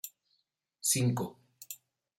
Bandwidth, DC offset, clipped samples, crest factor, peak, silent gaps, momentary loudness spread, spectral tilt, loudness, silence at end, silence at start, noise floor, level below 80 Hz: 16.5 kHz; under 0.1%; under 0.1%; 20 dB; -16 dBFS; none; 19 LU; -4 dB/octave; -31 LUFS; 0.45 s; 0.05 s; -79 dBFS; -72 dBFS